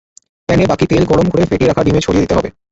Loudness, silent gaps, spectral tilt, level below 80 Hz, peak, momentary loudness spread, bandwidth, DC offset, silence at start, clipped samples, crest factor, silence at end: -13 LUFS; none; -6.5 dB/octave; -32 dBFS; 0 dBFS; 4 LU; 8 kHz; under 0.1%; 0.5 s; under 0.1%; 12 dB; 0.2 s